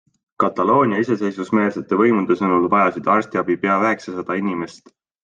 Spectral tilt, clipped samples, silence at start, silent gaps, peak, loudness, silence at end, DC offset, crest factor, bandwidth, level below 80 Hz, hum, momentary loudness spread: -7.5 dB/octave; under 0.1%; 0.4 s; none; -2 dBFS; -19 LUFS; 0.5 s; under 0.1%; 16 dB; 7.8 kHz; -64 dBFS; none; 8 LU